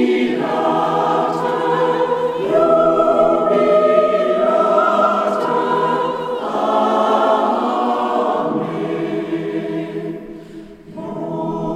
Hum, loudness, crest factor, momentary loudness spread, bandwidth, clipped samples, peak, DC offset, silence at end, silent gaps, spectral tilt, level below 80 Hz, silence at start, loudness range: none; -17 LUFS; 16 dB; 12 LU; 10.5 kHz; under 0.1%; 0 dBFS; under 0.1%; 0 s; none; -6.5 dB/octave; -54 dBFS; 0 s; 7 LU